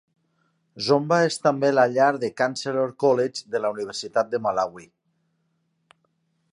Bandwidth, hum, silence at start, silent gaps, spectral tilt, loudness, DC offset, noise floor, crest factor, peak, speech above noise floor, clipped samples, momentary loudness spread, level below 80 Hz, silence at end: 11.5 kHz; none; 0.75 s; none; -5 dB/octave; -23 LUFS; under 0.1%; -71 dBFS; 18 dB; -6 dBFS; 49 dB; under 0.1%; 8 LU; -72 dBFS; 1.7 s